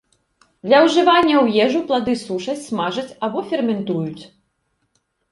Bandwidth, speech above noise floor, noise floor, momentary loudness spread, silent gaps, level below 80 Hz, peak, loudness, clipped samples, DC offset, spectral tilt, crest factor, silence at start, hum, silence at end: 11.5 kHz; 52 dB; -69 dBFS; 12 LU; none; -60 dBFS; -2 dBFS; -18 LUFS; under 0.1%; under 0.1%; -5 dB/octave; 18 dB; 0.65 s; none; 1.05 s